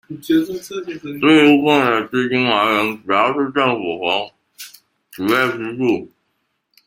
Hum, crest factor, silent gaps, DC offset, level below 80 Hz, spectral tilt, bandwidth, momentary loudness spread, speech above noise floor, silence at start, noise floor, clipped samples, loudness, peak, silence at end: none; 18 dB; none; under 0.1%; -60 dBFS; -5 dB/octave; 16.5 kHz; 17 LU; 53 dB; 0.1 s; -70 dBFS; under 0.1%; -17 LUFS; 0 dBFS; 0.8 s